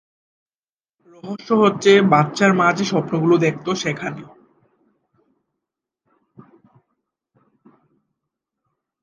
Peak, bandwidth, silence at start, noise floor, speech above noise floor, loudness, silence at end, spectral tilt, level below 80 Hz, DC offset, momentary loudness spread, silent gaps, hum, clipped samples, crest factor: 0 dBFS; 9.8 kHz; 1.25 s; under -90 dBFS; over 73 dB; -17 LUFS; 4.8 s; -5.5 dB/octave; -66 dBFS; under 0.1%; 19 LU; none; none; under 0.1%; 22 dB